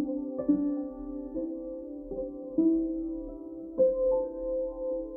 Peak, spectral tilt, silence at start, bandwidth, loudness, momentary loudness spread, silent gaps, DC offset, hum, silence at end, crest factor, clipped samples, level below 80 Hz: -14 dBFS; -13.5 dB/octave; 0 s; 1.9 kHz; -31 LUFS; 12 LU; none; under 0.1%; none; 0 s; 16 dB; under 0.1%; -52 dBFS